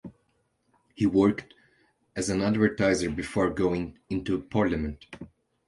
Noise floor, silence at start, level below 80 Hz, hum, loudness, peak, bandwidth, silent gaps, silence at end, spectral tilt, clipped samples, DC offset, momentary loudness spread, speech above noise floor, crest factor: -72 dBFS; 0.05 s; -48 dBFS; none; -27 LUFS; -8 dBFS; 11.5 kHz; none; 0.4 s; -6 dB/octave; under 0.1%; under 0.1%; 14 LU; 46 dB; 20 dB